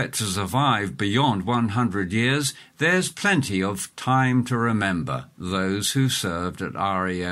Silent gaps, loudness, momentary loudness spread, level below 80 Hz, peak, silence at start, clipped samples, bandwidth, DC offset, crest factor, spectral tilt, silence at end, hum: none; -23 LUFS; 7 LU; -54 dBFS; -6 dBFS; 0 s; under 0.1%; 16 kHz; under 0.1%; 16 dB; -4.5 dB/octave; 0 s; none